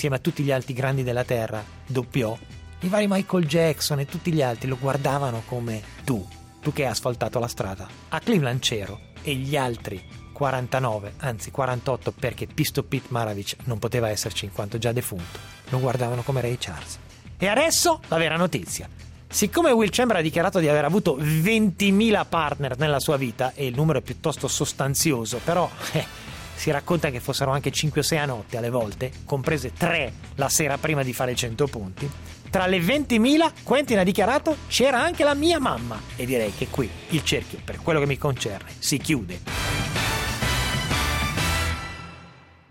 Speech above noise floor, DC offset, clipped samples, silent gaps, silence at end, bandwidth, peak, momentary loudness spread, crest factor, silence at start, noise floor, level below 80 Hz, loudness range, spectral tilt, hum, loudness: 24 dB; under 0.1%; under 0.1%; none; 0.4 s; 16.5 kHz; -8 dBFS; 12 LU; 16 dB; 0 s; -48 dBFS; -44 dBFS; 6 LU; -4.5 dB/octave; none; -24 LUFS